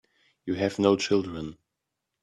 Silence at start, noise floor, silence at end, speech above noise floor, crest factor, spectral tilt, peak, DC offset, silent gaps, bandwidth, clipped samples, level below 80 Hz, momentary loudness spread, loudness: 0.45 s; -84 dBFS; 0.7 s; 58 dB; 22 dB; -5.5 dB/octave; -6 dBFS; under 0.1%; none; 11 kHz; under 0.1%; -62 dBFS; 17 LU; -26 LUFS